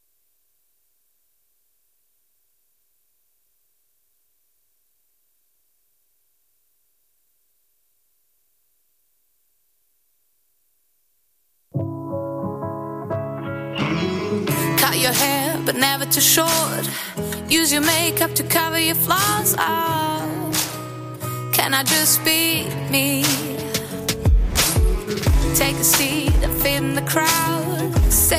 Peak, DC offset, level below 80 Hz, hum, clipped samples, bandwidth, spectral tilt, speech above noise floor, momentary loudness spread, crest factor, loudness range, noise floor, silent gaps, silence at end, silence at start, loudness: -4 dBFS; under 0.1%; -30 dBFS; none; under 0.1%; 15.5 kHz; -3 dB/octave; 49 dB; 13 LU; 18 dB; 13 LU; -68 dBFS; none; 0 s; 11.75 s; -19 LUFS